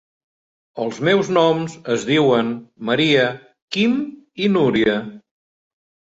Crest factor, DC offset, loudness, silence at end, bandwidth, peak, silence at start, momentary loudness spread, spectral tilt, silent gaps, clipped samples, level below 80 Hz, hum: 18 dB; under 0.1%; -19 LUFS; 0.95 s; 8 kHz; -2 dBFS; 0.75 s; 12 LU; -5.5 dB/octave; 3.62-3.68 s; under 0.1%; -58 dBFS; none